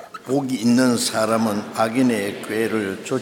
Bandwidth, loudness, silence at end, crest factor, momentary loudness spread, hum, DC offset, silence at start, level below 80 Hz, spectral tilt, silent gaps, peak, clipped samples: 17.5 kHz; -21 LUFS; 0 s; 16 dB; 8 LU; none; under 0.1%; 0 s; -68 dBFS; -4.5 dB/octave; none; -4 dBFS; under 0.1%